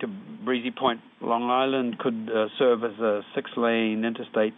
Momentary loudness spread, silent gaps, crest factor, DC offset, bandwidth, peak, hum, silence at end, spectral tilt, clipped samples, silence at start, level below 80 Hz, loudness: 6 LU; none; 18 dB; under 0.1%; 4 kHz; -8 dBFS; none; 0.05 s; -3 dB/octave; under 0.1%; 0 s; -80 dBFS; -26 LUFS